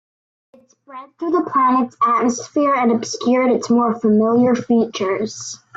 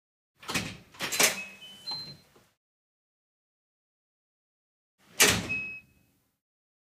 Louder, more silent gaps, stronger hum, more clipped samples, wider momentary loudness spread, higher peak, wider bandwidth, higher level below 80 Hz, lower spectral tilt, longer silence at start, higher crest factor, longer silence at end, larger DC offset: first, -17 LUFS vs -27 LUFS; second, none vs 2.57-4.98 s; neither; neither; second, 9 LU vs 21 LU; about the same, -6 dBFS vs -6 dBFS; second, 8 kHz vs 16 kHz; about the same, -62 dBFS vs -60 dBFS; first, -5 dB/octave vs -1 dB/octave; first, 0.9 s vs 0.4 s; second, 12 dB vs 28 dB; second, 0.2 s vs 1.05 s; neither